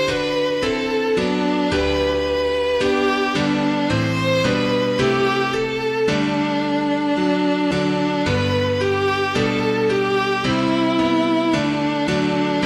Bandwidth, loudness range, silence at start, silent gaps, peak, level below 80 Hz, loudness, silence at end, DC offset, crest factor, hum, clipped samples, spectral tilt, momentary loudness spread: 13 kHz; 1 LU; 0 s; none; -6 dBFS; -42 dBFS; -19 LUFS; 0 s; under 0.1%; 12 dB; none; under 0.1%; -5.5 dB/octave; 2 LU